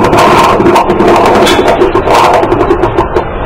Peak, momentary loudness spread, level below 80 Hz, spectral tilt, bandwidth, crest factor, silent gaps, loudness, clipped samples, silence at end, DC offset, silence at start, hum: 0 dBFS; 4 LU; -22 dBFS; -5 dB/octave; 16.5 kHz; 6 dB; none; -6 LUFS; 3%; 0 s; under 0.1%; 0 s; none